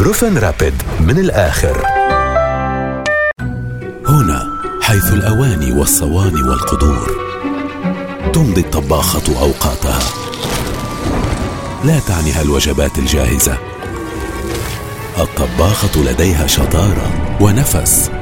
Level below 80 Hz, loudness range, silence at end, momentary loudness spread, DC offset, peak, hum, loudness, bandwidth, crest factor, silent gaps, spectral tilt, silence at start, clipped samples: -22 dBFS; 3 LU; 0 s; 9 LU; under 0.1%; 0 dBFS; none; -14 LUFS; 16.5 kHz; 14 dB; none; -4.5 dB/octave; 0 s; under 0.1%